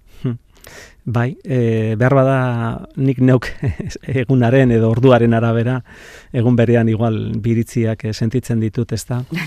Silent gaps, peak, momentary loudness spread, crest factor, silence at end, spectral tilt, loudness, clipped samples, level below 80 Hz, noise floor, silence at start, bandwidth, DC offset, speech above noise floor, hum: none; 0 dBFS; 11 LU; 16 dB; 0 s; -8 dB/octave; -16 LUFS; under 0.1%; -42 dBFS; -40 dBFS; 0.2 s; 13.5 kHz; under 0.1%; 25 dB; none